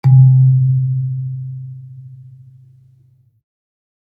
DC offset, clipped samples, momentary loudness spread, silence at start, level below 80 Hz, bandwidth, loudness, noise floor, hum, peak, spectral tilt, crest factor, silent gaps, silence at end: under 0.1%; under 0.1%; 26 LU; 0.05 s; -64 dBFS; 2.3 kHz; -13 LUFS; -52 dBFS; none; -2 dBFS; -12 dB/octave; 14 dB; none; 1.85 s